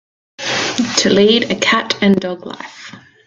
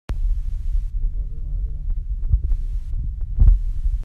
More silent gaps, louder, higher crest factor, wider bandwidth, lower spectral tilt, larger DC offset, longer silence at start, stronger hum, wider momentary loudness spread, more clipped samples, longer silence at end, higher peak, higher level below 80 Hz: neither; first, -14 LUFS vs -26 LUFS; about the same, 16 dB vs 18 dB; first, 9.4 kHz vs 1.8 kHz; second, -3.5 dB/octave vs -9 dB/octave; neither; first, 0.4 s vs 0.1 s; neither; first, 19 LU vs 11 LU; neither; first, 0.3 s vs 0 s; about the same, 0 dBFS vs -2 dBFS; second, -54 dBFS vs -20 dBFS